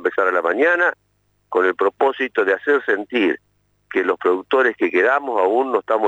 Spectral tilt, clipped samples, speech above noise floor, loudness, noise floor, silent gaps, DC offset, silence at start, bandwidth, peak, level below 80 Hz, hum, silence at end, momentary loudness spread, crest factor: -5 dB/octave; under 0.1%; 24 dB; -18 LUFS; -42 dBFS; none; under 0.1%; 0 s; 8 kHz; -6 dBFS; -70 dBFS; 50 Hz at -65 dBFS; 0 s; 4 LU; 14 dB